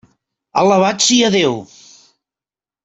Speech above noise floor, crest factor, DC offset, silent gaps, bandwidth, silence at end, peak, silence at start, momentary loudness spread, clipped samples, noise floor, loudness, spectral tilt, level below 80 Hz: over 77 dB; 16 dB; under 0.1%; none; 8.2 kHz; 1.2 s; 0 dBFS; 0.55 s; 9 LU; under 0.1%; under -90 dBFS; -13 LUFS; -3 dB/octave; -60 dBFS